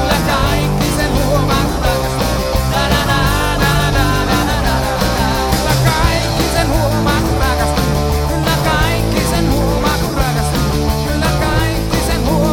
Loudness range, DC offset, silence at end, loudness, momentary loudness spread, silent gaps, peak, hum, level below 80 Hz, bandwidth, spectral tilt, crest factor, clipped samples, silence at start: 1 LU; under 0.1%; 0 s; -15 LUFS; 2 LU; none; 0 dBFS; none; -20 dBFS; 18.5 kHz; -5 dB/octave; 14 dB; under 0.1%; 0 s